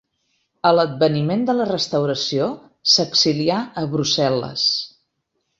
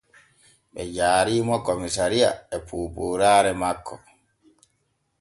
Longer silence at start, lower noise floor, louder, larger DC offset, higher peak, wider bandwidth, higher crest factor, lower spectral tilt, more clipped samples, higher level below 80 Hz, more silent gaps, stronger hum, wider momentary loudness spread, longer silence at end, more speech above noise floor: about the same, 0.65 s vs 0.75 s; about the same, -73 dBFS vs -72 dBFS; first, -19 LUFS vs -23 LUFS; neither; first, -2 dBFS vs -6 dBFS; second, 8 kHz vs 11.5 kHz; about the same, 18 dB vs 18 dB; about the same, -4.5 dB/octave vs -4 dB/octave; neither; second, -60 dBFS vs -50 dBFS; neither; neither; second, 8 LU vs 15 LU; second, 0.7 s vs 1.25 s; first, 54 dB vs 49 dB